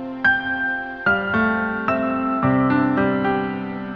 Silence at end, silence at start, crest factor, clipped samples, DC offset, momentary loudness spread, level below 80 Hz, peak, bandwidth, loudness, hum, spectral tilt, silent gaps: 0 s; 0 s; 16 dB; under 0.1%; under 0.1%; 5 LU; -48 dBFS; -6 dBFS; 5.8 kHz; -20 LUFS; none; -8.5 dB/octave; none